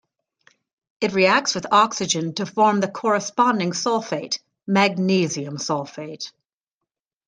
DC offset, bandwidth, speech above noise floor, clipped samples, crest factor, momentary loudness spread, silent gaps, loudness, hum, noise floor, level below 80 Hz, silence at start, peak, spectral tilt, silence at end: under 0.1%; 10 kHz; 64 dB; under 0.1%; 20 dB; 11 LU; none; -21 LUFS; none; -85 dBFS; -68 dBFS; 1 s; -2 dBFS; -4 dB/octave; 1 s